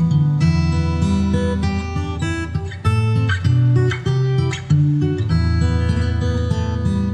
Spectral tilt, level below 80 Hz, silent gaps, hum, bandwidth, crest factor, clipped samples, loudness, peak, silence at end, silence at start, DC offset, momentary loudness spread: -7.5 dB/octave; -28 dBFS; none; none; 9.6 kHz; 12 dB; under 0.1%; -18 LUFS; -6 dBFS; 0 s; 0 s; under 0.1%; 6 LU